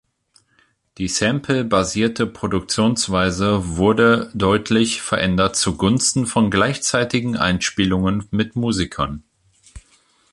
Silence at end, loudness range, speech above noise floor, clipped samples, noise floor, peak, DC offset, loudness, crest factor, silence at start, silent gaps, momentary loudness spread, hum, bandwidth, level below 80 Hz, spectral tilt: 0.55 s; 3 LU; 42 dB; under 0.1%; -61 dBFS; -2 dBFS; under 0.1%; -19 LUFS; 16 dB; 1 s; none; 6 LU; none; 11.5 kHz; -40 dBFS; -4.5 dB/octave